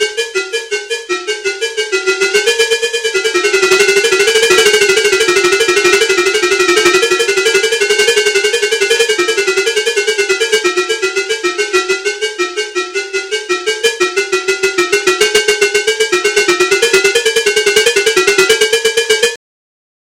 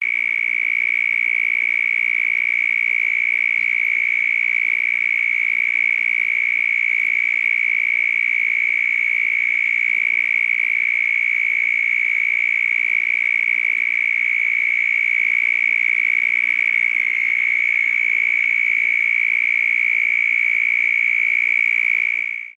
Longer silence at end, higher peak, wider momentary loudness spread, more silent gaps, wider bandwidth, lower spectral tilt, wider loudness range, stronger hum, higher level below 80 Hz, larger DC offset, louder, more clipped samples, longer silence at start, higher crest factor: first, 0.65 s vs 0.05 s; first, 0 dBFS vs -8 dBFS; first, 8 LU vs 1 LU; neither; first, 16.5 kHz vs 9.6 kHz; about the same, -0.5 dB/octave vs 0 dB/octave; first, 5 LU vs 1 LU; neither; first, -52 dBFS vs -74 dBFS; neither; first, -11 LUFS vs -16 LUFS; neither; about the same, 0 s vs 0 s; about the same, 12 dB vs 12 dB